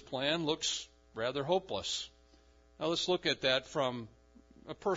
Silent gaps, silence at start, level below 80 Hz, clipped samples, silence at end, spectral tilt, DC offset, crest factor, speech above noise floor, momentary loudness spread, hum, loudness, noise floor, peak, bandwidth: none; 0.05 s; -66 dBFS; under 0.1%; 0 s; -2 dB/octave; under 0.1%; 20 dB; 29 dB; 15 LU; none; -34 LUFS; -63 dBFS; -16 dBFS; 7.4 kHz